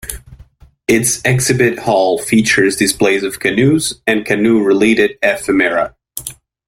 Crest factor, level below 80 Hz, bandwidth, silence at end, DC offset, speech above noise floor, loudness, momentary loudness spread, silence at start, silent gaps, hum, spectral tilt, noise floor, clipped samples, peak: 14 dB; -44 dBFS; 16.5 kHz; 0.35 s; under 0.1%; 30 dB; -13 LUFS; 13 LU; 0.05 s; none; none; -4 dB/octave; -43 dBFS; under 0.1%; 0 dBFS